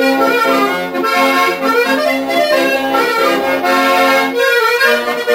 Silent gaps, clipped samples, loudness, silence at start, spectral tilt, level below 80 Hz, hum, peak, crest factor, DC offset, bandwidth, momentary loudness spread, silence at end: none; under 0.1%; -12 LUFS; 0 s; -2.5 dB/octave; -56 dBFS; none; 0 dBFS; 12 dB; under 0.1%; 16.5 kHz; 4 LU; 0 s